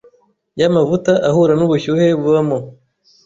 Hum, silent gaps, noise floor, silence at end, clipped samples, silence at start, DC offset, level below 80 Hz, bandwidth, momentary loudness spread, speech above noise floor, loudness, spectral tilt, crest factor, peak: none; none; -54 dBFS; 0.55 s; under 0.1%; 0.55 s; under 0.1%; -52 dBFS; 7.8 kHz; 7 LU; 40 dB; -15 LUFS; -7 dB/octave; 12 dB; -2 dBFS